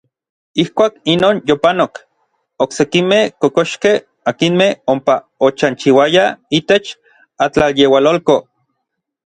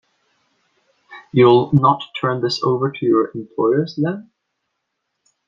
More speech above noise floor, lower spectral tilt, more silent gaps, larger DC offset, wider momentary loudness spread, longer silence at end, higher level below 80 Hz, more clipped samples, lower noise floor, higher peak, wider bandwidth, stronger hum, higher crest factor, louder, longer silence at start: about the same, 61 dB vs 59 dB; second, -5 dB/octave vs -7.5 dB/octave; neither; neither; about the same, 8 LU vs 10 LU; second, 0.95 s vs 1.25 s; first, -50 dBFS vs -60 dBFS; neither; about the same, -74 dBFS vs -75 dBFS; about the same, 0 dBFS vs -2 dBFS; first, 10 kHz vs 7.4 kHz; neither; about the same, 14 dB vs 18 dB; first, -14 LUFS vs -17 LUFS; second, 0.55 s vs 1.1 s